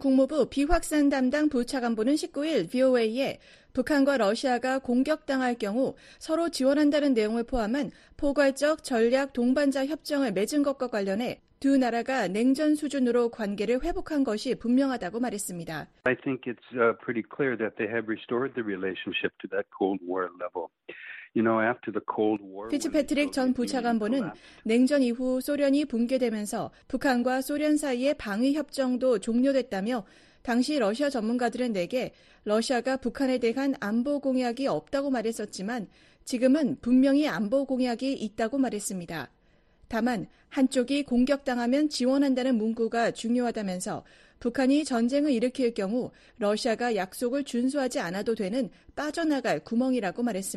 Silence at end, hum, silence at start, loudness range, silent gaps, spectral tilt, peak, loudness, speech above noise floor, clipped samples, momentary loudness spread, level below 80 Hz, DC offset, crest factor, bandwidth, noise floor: 0 s; none; 0 s; 3 LU; none; -5 dB/octave; -10 dBFS; -27 LUFS; 34 dB; under 0.1%; 9 LU; -50 dBFS; under 0.1%; 16 dB; 13 kHz; -61 dBFS